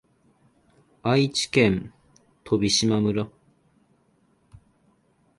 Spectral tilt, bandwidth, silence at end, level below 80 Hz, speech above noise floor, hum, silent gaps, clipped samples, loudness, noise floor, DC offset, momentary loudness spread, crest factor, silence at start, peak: -4.5 dB/octave; 11.5 kHz; 2.1 s; -54 dBFS; 42 dB; none; none; under 0.1%; -23 LUFS; -64 dBFS; under 0.1%; 11 LU; 22 dB; 1.05 s; -4 dBFS